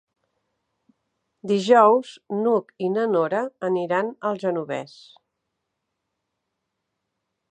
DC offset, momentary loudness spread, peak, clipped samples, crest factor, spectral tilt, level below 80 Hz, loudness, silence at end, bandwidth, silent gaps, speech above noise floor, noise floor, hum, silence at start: under 0.1%; 16 LU; -2 dBFS; under 0.1%; 22 dB; -6 dB/octave; -80 dBFS; -22 LUFS; 2.65 s; 9.4 kHz; none; 58 dB; -80 dBFS; none; 1.45 s